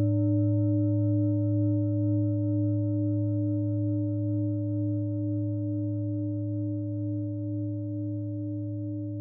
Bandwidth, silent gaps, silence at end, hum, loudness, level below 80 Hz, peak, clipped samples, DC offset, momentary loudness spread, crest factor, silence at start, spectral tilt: 1.4 kHz; none; 0 s; none; -29 LUFS; -70 dBFS; -16 dBFS; under 0.1%; under 0.1%; 7 LU; 10 dB; 0 s; -17 dB/octave